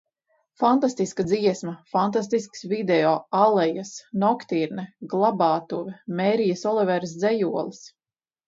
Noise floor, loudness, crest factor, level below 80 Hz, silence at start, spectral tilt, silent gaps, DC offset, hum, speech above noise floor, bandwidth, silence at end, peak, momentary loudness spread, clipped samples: under -90 dBFS; -23 LUFS; 18 dB; -66 dBFS; 0.6 s; -6 dB/octave; none; under 0.1%; none; over 67 dB; 7.8 kHz; 0.6 s; -6 dBFS; 11 LU; under 0.1%